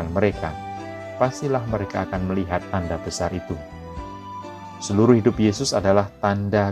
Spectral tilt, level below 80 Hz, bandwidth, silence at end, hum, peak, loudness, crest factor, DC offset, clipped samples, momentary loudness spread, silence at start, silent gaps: -6 dB/octave; -44 dBFS; 13 kHz; 0 s; none; -2 dBFS; -22 LUFS; 20 dB; under 0.1%; under 0.1%; 18 LU; 0 s; none